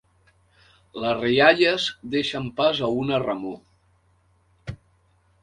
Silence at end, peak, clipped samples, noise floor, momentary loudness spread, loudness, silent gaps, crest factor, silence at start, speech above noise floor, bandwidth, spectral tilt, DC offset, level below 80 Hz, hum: 0.65 s; -2 dBFS; under 0.1%; -63 dBFS; 23 LU; -22 LUFS; none; 22 dB; 0.95 s; 41 dB; 10.5 kHz; -5 dB/octave; under 0.1%; -56 dBFS; none